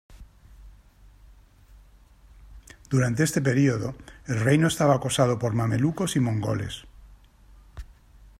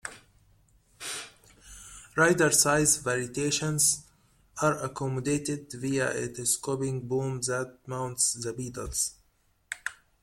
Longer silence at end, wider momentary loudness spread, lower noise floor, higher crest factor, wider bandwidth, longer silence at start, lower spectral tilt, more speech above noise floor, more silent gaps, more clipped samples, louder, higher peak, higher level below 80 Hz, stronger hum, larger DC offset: first, 0.5 s vs 0.3 s; about the same, 17 LU vs 17 LU; second, -53 dBFS vs -68 dBFS; about the same, 20 dB vs 24 dB; about the same, 15.5 kHz vs 16.5 kHz; about the same, 0.1 s vs 0.05 s; first, -6 dB/octave vs -3 dB/octave; second, 30 dB vs 40 dB; neither; neither; first, -24 LUFS vs -28 LUFS; about the same, -8 dBFS vs -6 dBFS; first, -50 dBFS vs -56 dBFS; neither; neither